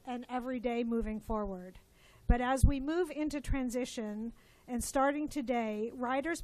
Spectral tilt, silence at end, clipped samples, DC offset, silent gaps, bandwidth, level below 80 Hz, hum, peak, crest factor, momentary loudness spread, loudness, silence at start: -6 dB/octave; 0 s; under 0.1%; under 0.1%; none; 14 kHz; -40 dBFS; none; -12 dBFS; 22 dB; 11 LU; -35 LUFS; 0.05 s